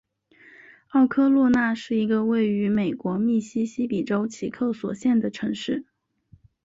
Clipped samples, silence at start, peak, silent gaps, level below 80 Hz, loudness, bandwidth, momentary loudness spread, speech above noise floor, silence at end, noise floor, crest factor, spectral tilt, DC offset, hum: under 0.1%; 0.95 s; -10 dBFS; none; -62 dBFS; -24 LUFS; 7.8 kHz; 9 LU; 35 dB; 0.85 s; -57 dBFS; 14 dB; -6.5 dB/octave; under 0.1%; none